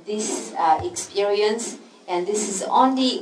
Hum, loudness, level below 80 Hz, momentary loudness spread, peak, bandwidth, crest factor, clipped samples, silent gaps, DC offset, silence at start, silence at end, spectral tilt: none; -22 LUFS; -62 dBFS; 10 LU; -4 dBFS; 11 kHz; 18 dB; under 0.1%; none; under 0.1%; 0 s; 0 s; -3 dB/octave